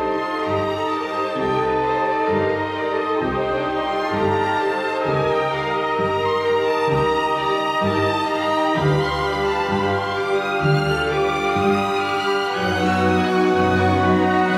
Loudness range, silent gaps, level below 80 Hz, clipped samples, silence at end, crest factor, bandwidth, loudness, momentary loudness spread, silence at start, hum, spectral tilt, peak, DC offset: 2 LU; none; -46 dBFS; under 0.1%; 0 s; 14 dB; 14.5 kHz; -20 LUFS; 5 LU; 0 s; none; -6 dB/octave; -6 dBFS; under 0.1%